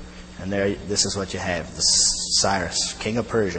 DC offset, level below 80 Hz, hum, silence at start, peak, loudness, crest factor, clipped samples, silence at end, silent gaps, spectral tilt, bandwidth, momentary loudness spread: under 0.1%; -44 dBFS; none; 0 s; -6 dBFS; -21 LUFS; 16 dB; under 0.1%; 0 s; none; -2 dB/octave; 8.8 kHz; 10 LU